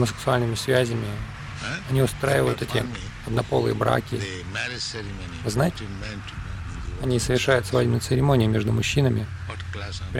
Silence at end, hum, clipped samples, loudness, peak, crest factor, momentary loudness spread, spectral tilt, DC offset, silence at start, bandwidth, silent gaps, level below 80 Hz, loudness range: 0 s; none; under 0.1%; -25 LUFS; -6 dBFS; 18 dB; 13 LU; -5.5 dB/octave; under 0.1%; 0 s; 16 kHz; none; -40 dBFS; 5 LU